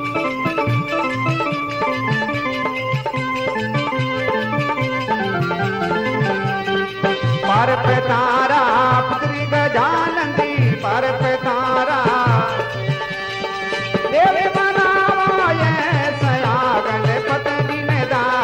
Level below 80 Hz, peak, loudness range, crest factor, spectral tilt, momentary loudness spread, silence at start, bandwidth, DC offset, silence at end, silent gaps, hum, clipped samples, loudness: -50 dBFS; -4 dBFS; 4 LU; 14 dB; -6.5 dB/octave; 6 LU; 0 s; 10 kHz; under 0.1%; 0 s; none; none; under 0.1%; -18 LUFS